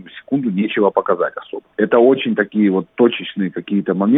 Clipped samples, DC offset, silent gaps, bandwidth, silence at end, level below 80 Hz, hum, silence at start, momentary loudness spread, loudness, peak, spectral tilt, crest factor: under 0.1%; under 0.1%; none; 3.9 kHz; 0 s; -64 dBFS; none; 0.05 s; 10 LU; -17 LUFS; -2 dBFS; -10.5 dB/octave; 16 dB